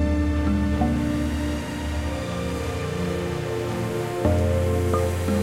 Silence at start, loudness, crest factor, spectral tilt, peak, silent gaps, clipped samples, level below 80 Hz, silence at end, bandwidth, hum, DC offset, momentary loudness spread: 0 s; -25 LUFS; 14 dB; -6.5 dB/octave; -8 dBFS; none; under 0.1%; -32 dBFS; 0 s; 16 kHz; none; under 0.1%; 6 LU